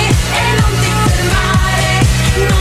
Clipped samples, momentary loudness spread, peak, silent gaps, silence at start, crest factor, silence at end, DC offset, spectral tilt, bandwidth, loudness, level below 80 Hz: under 0.1%; 1 LU; 0 dBFS; none; 0 s; 10 dB; 0 s; under 0.1%; -4.5 dB/octave; 15.5 kHz; -12 LUFS; -18 dBFS